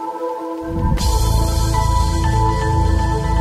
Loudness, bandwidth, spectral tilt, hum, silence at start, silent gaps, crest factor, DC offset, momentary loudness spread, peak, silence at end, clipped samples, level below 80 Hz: -18 LUFS; 15.5 kHz; -5.5 dB/octave; none; 0 s; none; 12 dB; under 0.1%; 7 LU; -4 dBFS; 0 s; under 0.1%; -20 dBFS